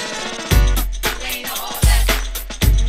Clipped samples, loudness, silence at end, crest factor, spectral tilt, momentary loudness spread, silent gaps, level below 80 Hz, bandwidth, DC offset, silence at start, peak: under 0.1%; -19 LUFS; 0 s; 16 dB; -3.5 dB/octave; 8 LU; none; -18 dBFS; 16 kHz; under 0.1%; 0 s; -2 dBFS